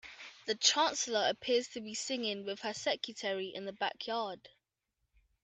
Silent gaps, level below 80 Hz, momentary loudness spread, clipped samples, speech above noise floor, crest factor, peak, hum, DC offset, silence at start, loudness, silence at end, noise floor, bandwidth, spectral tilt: none; -78 dBFS; 13 LU; under 0.1%; 50 dB; 24 dB; -12 dBFS; none; under 0.1%; 0.05 s; -34 LUFS; 0.95 s; -85 dBFS; 9.2 kHz; -1 dB/octave